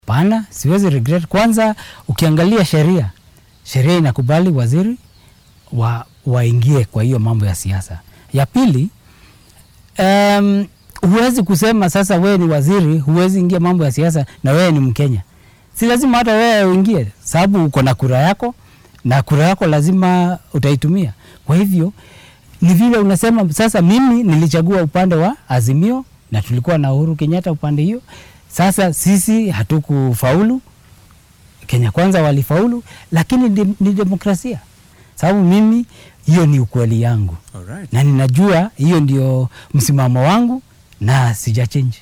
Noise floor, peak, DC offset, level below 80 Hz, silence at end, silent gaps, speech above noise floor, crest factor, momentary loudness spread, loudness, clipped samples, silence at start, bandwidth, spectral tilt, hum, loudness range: -47 dBFS; 0 dBFS; under 0.1%; -42 dBFS; 0.05 s; none; 34 dB; 14 dB; 10 LU; -14 LUFS; under 0.1%; 0.05 s; 17 kHz; -6.5 dB/octave; none; 3 LU